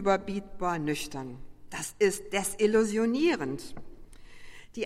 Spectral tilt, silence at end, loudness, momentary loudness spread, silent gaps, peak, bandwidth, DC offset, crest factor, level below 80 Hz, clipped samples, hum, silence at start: -4.5 dB/octave; 0 s; -29 LUFS; 17 LU; none; -12 dBFS; 16 kHz; under 0.1%; 18 dB; -52 dBFS; under 0.1%; none; 0 s